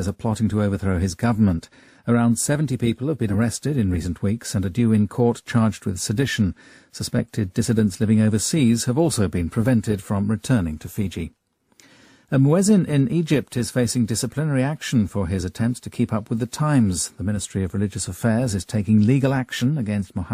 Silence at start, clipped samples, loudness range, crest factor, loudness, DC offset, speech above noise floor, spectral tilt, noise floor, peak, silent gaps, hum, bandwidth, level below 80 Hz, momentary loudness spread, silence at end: 0 s; under 0.1%; 3 LU; 16 dB; -22 LUFS; under 0.1%; 35 dB; -6 dB/octave; -56 dBFS; -6 dBFS; none; none; 15.5 kHz; -46 dBFS; 7 LU; 0 s